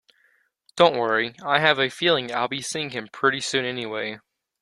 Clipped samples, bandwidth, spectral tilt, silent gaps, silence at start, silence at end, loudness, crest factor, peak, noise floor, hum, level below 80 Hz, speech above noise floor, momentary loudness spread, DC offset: under 0.1%; 12.5 kHz; -3 dB/octave; none; 0.75 s; 0.45 s; -23 LUFS; 22 dB; -2 dBFS; -65 dBFS; none; -66 dBFS; 42 dB; 11 LU; under 0.1%